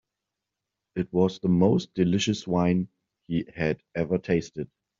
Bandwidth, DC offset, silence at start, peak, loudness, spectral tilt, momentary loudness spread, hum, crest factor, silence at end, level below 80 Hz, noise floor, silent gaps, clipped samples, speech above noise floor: 7.6 kHz; under 0.1%; 0.95 s; -8 dBFS; -26 LUFS; -6.5 dB/octave; 12 LU; none; 20 dB; 0.35 s; -56 dBFS; -86 dBFS; none; under 0.1%; 61 dB